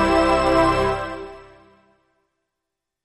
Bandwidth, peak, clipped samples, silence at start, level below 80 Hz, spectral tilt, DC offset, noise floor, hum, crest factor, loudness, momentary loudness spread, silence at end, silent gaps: 12 kHz; -6 dBFS; under 0.1%; 0 s; -38 dBFS; -5.5 dB/octave; under 0.1%; -83 dBFS; none; 16 dB; -19 LUFS; 17 LU; 1.65 s; none